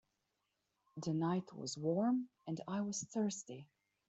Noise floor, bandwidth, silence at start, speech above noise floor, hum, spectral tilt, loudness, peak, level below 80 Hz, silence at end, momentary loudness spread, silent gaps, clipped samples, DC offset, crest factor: -86 dBFS; 8.2 kHz; 0.95 s; 47 dB; none; -5.5 dB/octave; -40 LUFS; -26 dBFS; -82 dBFS; 0.45 s; 12 LU; none; under 0.1%; under 0.1%; 16 dB